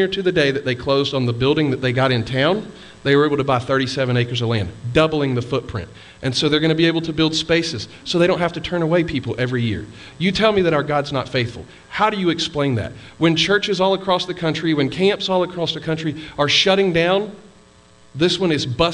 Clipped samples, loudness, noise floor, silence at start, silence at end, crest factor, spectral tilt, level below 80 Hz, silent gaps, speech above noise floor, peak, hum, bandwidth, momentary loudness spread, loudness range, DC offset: under 0.1%; -19 LUFS; -49 dBFS; 0 s; 0 s; 16 dB; -5.5 dB/octave; -46 dBFS; none; 30 dB; -2 dBFS; none; 10.5 kHz; 9 LU; 2 LU; under 0.1%